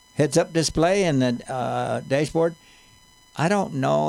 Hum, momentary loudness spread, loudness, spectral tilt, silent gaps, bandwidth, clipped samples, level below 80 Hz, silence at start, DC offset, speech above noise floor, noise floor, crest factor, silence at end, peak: none; 6 LU; -23 LUFS; -5.5 dB/octave; none; 14.5 kHz; under 0.1%; -50 dBFS; 0.15 s; under 0.1%; 32 dB; -53 dBFS; 16 dB; 0 s; -6 dBFS